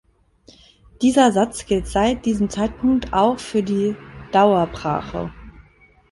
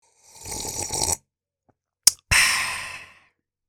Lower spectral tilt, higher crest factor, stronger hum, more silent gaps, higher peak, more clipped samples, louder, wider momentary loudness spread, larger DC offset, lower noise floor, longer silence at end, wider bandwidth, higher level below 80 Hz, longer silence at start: first, -5.5 dB/octave vs 0 dB/octave; second, 18 dB vs 26 dB; neither; neither; about the same, -2 dBFS vs 0 dBFS; neither; about the same, -19 LUFS vs -21 LUFS; second, 9 LU vs 18 LU; neither; second, -53 dBFS vs -71 dBFS; second, 0.5 s vs 0.65 s; second, 11.5 kHz vs 18 kHz; about the same, -42 dBFS vs -46 dBFS; first, 1 s vs 0.35 s